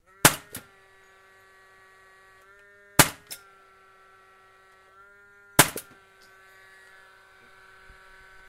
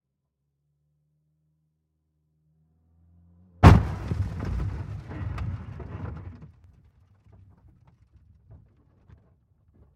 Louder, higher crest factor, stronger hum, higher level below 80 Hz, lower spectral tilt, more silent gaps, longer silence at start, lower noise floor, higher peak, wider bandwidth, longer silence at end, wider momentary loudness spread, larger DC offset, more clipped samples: about the same, -22 LUFS vs -24 LUFS; about the same, 30 dB vs 28 dB; neither; second, -54 dBFS vs -36 dBFS; second, -2 dB/octave vs -8 dB/octave; neither; second, 0.25 s vs 3.6 s; second, -56 dBFS vs -80 dBFS; about the same, 0 dBFS vs 0 dBFS; first, 16 kHz vs 10.5 kHz; second, 2.7 s vs 3.5 s; about the same, 22 LU vs 23 LU; neither; neither